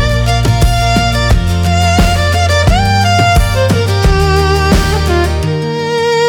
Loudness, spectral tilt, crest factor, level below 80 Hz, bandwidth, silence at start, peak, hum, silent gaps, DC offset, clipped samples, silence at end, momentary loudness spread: -11 LUFS; -5 dB/octave; 10 dB; -16 dBFS; 20 kHz; 0 s; 0 dBFS; none; none; under 0.1%; under 0.1%; 0 s; 3 LU